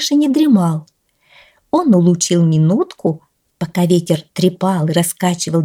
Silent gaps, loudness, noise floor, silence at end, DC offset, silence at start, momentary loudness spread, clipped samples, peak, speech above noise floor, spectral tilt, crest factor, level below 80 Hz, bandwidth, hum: none; -15 LUFS; -51 dBFS; 0 s; under 0.1%; 0 s; 9 LU; under 0.1%; -2 dBFS; 37 dB; -6 dB/octave; 14 dB; -60 dBFS; 16.5 kHz; none